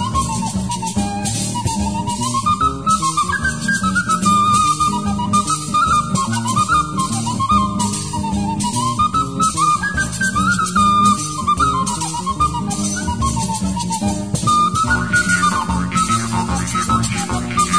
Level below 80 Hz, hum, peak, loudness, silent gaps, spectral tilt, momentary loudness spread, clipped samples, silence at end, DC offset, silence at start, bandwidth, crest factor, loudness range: -34 dBFS; none; -2 dBFS; -17 LUFS; none; -3.5 dB/octave; 6 LU; under 0.1%; 0 s; 0.6%; 0 s; 11 kHz; 14 dB; 3 LU